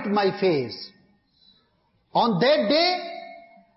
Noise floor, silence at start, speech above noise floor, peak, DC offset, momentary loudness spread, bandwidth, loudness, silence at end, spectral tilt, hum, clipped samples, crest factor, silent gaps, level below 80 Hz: -67 dBFS; 0 s; 45 dB; -10 dBFS; under 0.1%; 20 LU; 6 kHz; -22 LUFS; 0.35 s; -7.5 dB/octave; none; under 0.1%; 16 dB; none; -68 dBFS